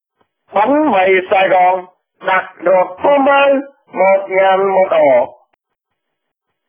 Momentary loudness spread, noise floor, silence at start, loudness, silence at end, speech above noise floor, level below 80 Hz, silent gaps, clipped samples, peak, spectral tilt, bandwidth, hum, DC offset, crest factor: 8 LU; -74 dBFS; 0.55 s; -12 LUFS; 1.4 s; 63 dB; -62 dBFS; none; under 0.1%; 0 dBFS; -8.5 dB/octave; 3.7 kHz; none; under 0.1%; 14 dB